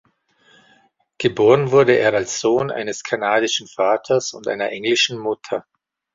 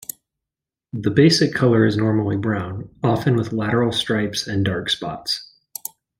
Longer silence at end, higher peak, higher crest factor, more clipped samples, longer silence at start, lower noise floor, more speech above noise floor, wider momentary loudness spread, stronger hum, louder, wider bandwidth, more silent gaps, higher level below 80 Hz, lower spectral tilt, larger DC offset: second, 0.55 s vs 0.75 s; about the same, -2 dBFS vs -2 dBFS; about the same, 18 dB vs 18 dB; neither; first, 1.2 s vs 0.95 s; second, -58 dBFS vs -87 dBFS; second, 40 dB vs 68 dB; second, 11 LU vs 17 LU; neither; about the same, -18 LUFS vs -20 LUFS; second, 7.8 kHz vs 16.5 kHz; neither; second, -60 dBFS vs -54 dBFS; second, -4 dB/octave vs -5.5 dB/octave; neither